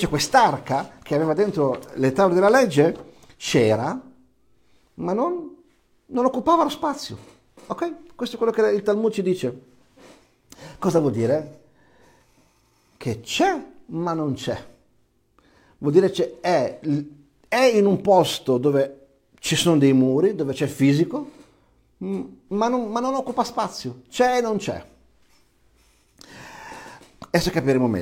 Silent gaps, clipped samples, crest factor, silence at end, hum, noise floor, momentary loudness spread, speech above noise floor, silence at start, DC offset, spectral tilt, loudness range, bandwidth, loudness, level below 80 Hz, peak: none; under 0.1%; 20 dB; 0 s; none; -63 dBFS; 16 LU; 42 dB; 0 s; under 0.1%; -5.5 dB/octave; 8 LU; 16.5 kHz; -22 LUFS; -54 dBFS; -2 dBFS